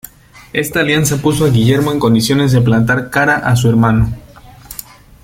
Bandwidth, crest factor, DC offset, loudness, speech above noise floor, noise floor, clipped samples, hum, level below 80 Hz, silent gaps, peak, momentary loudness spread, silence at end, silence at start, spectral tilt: 16.5 kHz; 12 dB; under 0.1%; -12 LUFS; 25 dB; -37 dBFS; under 0.1%; none; -34 dBFS; none; 0 dBFS; 16 LU; 0.45 s; 0.55 s; -5.5 dB/octave